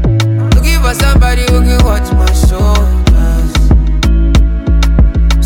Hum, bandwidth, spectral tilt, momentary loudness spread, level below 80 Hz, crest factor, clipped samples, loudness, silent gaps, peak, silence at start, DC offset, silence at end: none; 16.5 kHz; -5.5 dB/octave; 2 LU; -8 dBFS; 8 dB; under 0.1%; -10 LUFS; none; 0 dBFS; 0 s; under 0.1%; 0 s